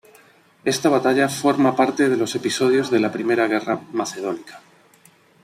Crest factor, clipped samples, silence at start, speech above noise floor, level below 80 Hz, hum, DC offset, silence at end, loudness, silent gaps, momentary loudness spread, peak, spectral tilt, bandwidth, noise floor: 18 dB; under 0.1%; 0.65 s; 34 dB; -66 dBFS; none; under 0.1%; 0.85 s; -20 LUFS; none; 9 LU; -4 dBFS; -4.5 dB/octave; 15.5 kHz; -54 dBFS